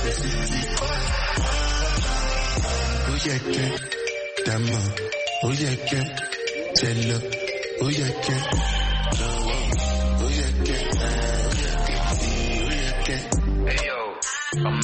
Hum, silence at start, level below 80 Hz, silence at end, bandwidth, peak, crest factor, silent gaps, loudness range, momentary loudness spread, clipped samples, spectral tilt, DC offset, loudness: none; 0 s; -26 dBFS; 0 s; 8.8 kHz; -4 dBFS; 20 dB; none; 1 LU; 3 LU; under 0.1%; -4 dB/octave; under 0.1%; -24 LUFS